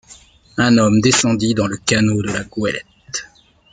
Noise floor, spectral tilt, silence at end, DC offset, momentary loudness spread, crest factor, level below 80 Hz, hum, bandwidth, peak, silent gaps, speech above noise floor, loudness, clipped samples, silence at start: -48 dBFS; -4.5 dB/octave; 0.45 s; under 0.1%; 15 LU; 16 dB; -48 dBFS; none; 9.6 kHz; 0 dBFS; none; 32 dB; -16 LUFS; under 0.1%; 0.1 s